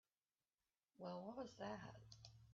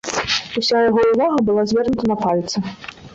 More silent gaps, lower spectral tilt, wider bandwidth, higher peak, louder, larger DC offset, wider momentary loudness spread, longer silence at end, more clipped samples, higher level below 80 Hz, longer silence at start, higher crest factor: neither; about the same, -5 dB/octave vs -4.5 dB/octave; about the same, 7.4 kHz vs 8 kHz; second, -38 dBFS vs -4 dBFS; second, -55 LUFS vs -18 LUFS; neither; about the same, 10 LU vs 9 LU; about the same, 0 s vs 0 s; neither; second, -80 dBFS vs -48 dBFS; first, 1 s vs 0.05 s; about the same, 18 dB vs 14 dB